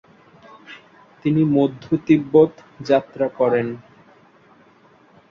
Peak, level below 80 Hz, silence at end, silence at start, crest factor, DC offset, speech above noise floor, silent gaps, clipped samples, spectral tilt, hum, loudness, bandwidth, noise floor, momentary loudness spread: -2 dBFS; -58 dBFS; 1.55 s; 0.7 s; 18 dB; under 0.1%; 34 dB; none; under 0.1%; -8.5 dB/octave; none; -19 LUFS; 6.8 kHz; -53 dBFS; 21 LU